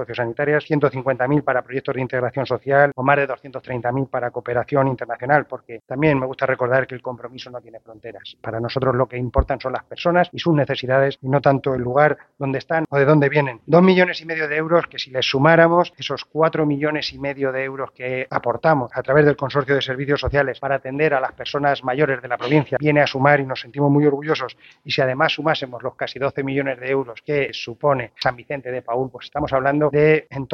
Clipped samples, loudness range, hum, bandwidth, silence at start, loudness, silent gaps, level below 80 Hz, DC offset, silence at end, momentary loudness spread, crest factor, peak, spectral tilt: under 0.1%; 6 LU; none; 6.6 kHz; 0 s; -20 LUFS; none; -42 dBFS; under 0.1%; 0 s; 11 LU; 20 dB; 0 dBFS; -7 dB/octave